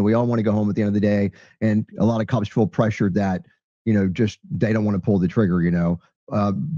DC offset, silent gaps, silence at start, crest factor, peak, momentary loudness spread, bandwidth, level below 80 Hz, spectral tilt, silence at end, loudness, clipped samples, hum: under 0.1%; 3.64-3.85 s, 6.16-6.27 s; 0 s; 14 dB; -6 dBFS; 6 LU; 7.2 kHz; -52 dBFS; -8.5 dB/octave; 0 s; -21 LUFS; under 0.1%; none